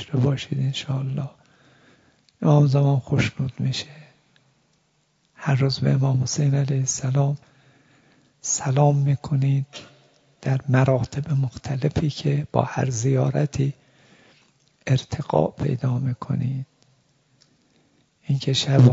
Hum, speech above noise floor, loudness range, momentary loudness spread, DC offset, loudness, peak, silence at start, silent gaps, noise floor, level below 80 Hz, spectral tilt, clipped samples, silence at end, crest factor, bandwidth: none; 45 dB; 4 LU; 11 LU; under 0.1%; -23 LUFS; -2 dBFS; 0 s; none; -66 dBFS; -52 dBFS; -6 dB/octave; under 0.1%; 0 s; 20 dB; 7.8 kHz